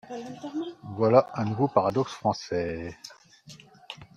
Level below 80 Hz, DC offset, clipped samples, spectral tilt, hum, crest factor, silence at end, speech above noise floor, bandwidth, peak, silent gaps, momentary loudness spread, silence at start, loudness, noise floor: -62 dBFS; under 0.1%; under 0.1%; -7 dB/octave; none; 24 dB; 0.1 s; 24 dB; 10.5 kHz; -4 dBFS; none; 21 LU; 0.05 s; -27 LUFS; -51 dBFS